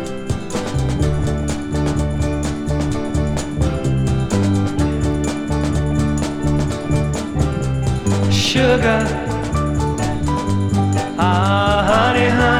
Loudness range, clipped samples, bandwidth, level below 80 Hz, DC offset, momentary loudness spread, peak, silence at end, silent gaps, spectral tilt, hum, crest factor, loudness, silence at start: 3 LU; under 0.1%; 14.5 kHz; -26 dBFS; under 0.1%; 7 LU; 0 dBFS; 0 s; none; -6 dB/octave; none; 16 dB; -18 LUFS; 0 s